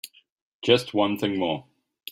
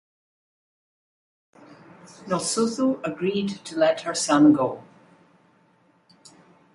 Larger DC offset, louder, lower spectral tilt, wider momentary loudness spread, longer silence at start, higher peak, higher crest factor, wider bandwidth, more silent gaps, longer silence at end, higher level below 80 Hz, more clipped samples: neither; about the same, -24 LUFS vs -23 LUFS; about the same, -5 dB/octave vs -4.5 dB/octave; first, 18 LU vs 12 LU; second, 0.05 s vs 2.2 s; about the same, -4 dBFS vs -6 dBFS; about the same, 22 dB vs 20 dB; first, 16 kHz vs 11.5 kHz; first, 0.30-0.60 s vs none; second, 0.5 s vs 1.95 s; about the same, -66 dBFS vs -68 dBFS; neither